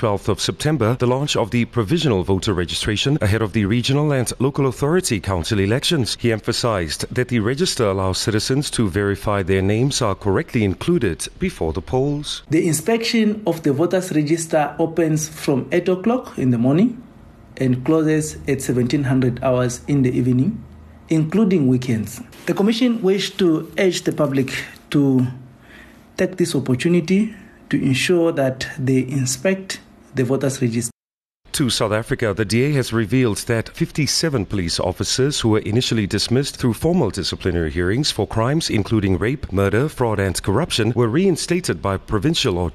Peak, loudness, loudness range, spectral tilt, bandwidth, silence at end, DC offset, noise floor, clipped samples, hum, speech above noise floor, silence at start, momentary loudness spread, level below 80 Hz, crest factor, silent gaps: -6 dBFS; -19 LUFS; 2 LU; -5.5 dB/octave; 13.5 kHz; 0 s; under 0.1%; under -90 dBFS; under 0.1%; none; over 71 dB; 0 s; 5 LU; -42 dBFS; 12 dB; 30.94-31.19 s, 31.34-31.38 s